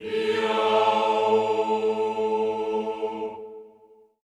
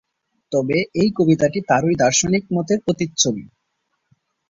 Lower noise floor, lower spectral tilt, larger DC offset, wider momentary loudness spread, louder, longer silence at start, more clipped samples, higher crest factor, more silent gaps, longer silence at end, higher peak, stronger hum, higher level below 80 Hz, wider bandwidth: second, -55 dBFS vs -73 dBFS; about the same, -4.5 dB/octave vs -4.5 dB/octave; neither; first, 12 LU vs 6 LU; second, -24 LUFS vs -18 LUFS; second, 0 s vs 0.5 s; neither; about the same, 16 dB vs 18 dB; neither; second, 0.6 s vs 1.05 s; second, -8 dBFS vs -2 dBFS; neither; second, -70 dBFS vs -52 dBFS; first, 10 kHz vs 7.8 kHz